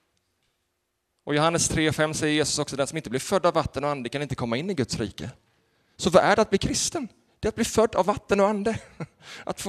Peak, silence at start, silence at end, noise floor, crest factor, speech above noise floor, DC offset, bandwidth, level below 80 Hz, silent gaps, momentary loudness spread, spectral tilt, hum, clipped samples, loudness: -2 dBFS; 1.25 s; 0 s; -77 dBFS; 24 dB; 52 dB; under 0.1%; 13.5 kHz; -48 dBFS; none; 14 LU; -4 dB/octave; none; under 0.1%; -24 LUFS